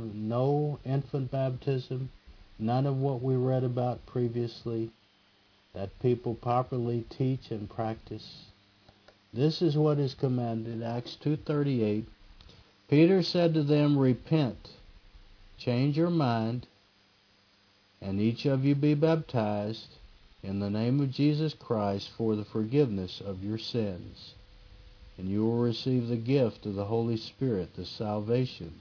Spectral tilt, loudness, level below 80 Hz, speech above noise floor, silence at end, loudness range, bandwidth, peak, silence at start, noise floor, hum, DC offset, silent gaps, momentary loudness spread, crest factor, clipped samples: -8.5 dB/octave; -30 LUFS; -60 dBFS; 35 dB; 0 s; 6 LU; 5.4 kHz; -10 dBFS; 0 s; -64 dBFS; none; under 0.1%; none; 13 LU; 18 dB; under 0.1%